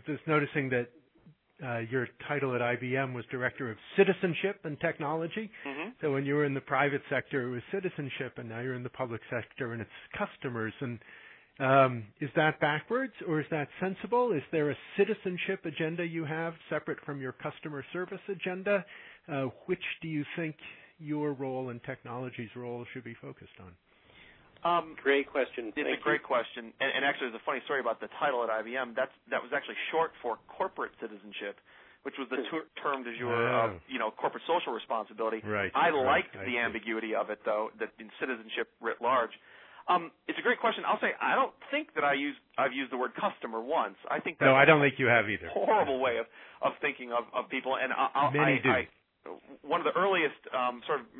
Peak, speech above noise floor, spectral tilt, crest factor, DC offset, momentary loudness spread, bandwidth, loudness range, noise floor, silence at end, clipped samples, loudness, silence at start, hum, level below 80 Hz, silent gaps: -8 dBFS; 30 dB; -9.5 dB/octave; 24 dB; under 0.1%; 13 LU; 4.2 kHz; 9 LU; -62 dBFS; 0 s; under 0.1%; -31 LUFS; 0.05 s; none; -72 dBFS; none